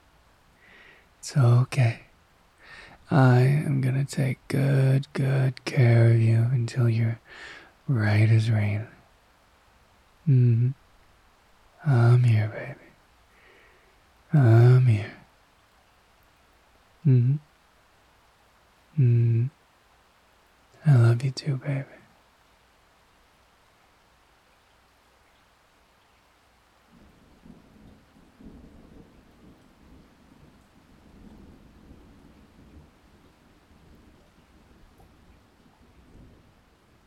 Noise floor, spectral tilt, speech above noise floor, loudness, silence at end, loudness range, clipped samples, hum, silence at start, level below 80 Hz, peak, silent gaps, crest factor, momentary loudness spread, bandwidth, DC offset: -61 dBFS; -8 dB/octave; 40 dB; -23 LUFS; 8.55 s; 6 LU; under 0.1%; none; 1.25 s; -62 dBFS; -6 dBFS; none; 20 dB; 21 LU; 10 kHz; under 0.1%